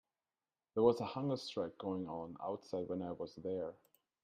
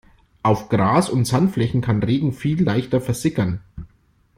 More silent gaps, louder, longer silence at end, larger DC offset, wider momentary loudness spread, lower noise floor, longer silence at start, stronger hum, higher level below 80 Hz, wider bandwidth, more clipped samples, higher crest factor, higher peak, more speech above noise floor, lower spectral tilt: neither; second, -40 LUFS vs -20 LUFS; about the same, 0.5 s vs 0.5 s; neither; first, 12 LU vs 7 LU; first, under -90 dBFS vs -58 dBFS; first, 0.75 s vs 0.45 s; neither; second, -76 dBFS vs -46 dBFS; second, 13.5 kHz vs 15.5 kHz; neither; about the same, 22 dB vs 18 dB; second, -18 dBFS vs -2 dBFS; first, over 51 dB vs 39 dB; about the same, -7 dB/octave vs -7 dB/octave